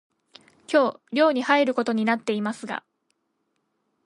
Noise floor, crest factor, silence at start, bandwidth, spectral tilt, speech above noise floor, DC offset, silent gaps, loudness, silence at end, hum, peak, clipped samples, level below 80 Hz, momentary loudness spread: -75 dBFS; 20 dB; 0.7 s; 11.5 kHz; -5 dB/octave; 52 dB; under 0.1%; none; -23 LUFS; 1.25 s; none; -6 dBFS; under 0.1%; -78 dBFS; 11 LU